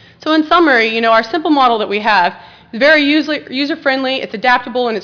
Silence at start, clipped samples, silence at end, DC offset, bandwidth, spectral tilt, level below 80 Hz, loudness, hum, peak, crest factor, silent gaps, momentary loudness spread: 0.25 s; under 0.1%; 0 s; under 0.1%; 5.4 kHz; -4.5 dB/octave; -54 dBFS; -13 LUFS; none; 0 dBFS; 12 dB; none; 8 LU